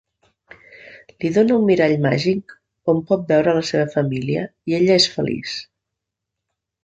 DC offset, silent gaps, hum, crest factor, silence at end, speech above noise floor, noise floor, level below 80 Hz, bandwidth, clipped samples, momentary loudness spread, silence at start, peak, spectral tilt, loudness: under 0.1%; none; none; 18 dB; 1.2 s; 64 dB; -82 dBFS; -56 dBFS; 9 kHz; under 0.1%; 11 LU; 0.85 s; -2 dBFS; -5.5 dB/octave; -19 LUFS